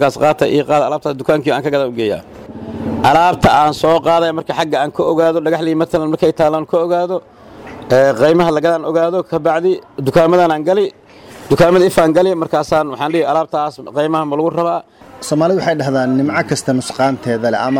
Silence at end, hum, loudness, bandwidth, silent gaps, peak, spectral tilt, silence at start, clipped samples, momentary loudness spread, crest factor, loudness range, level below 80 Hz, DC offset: 0 s; none; -14 LUFS; 16.5 kHz; none; -2 dBFS; -6 dB/octave; 0 s; under 0.1%; 9 LU; 12 dB; 3 LU; -44 dBFS; under 0.1%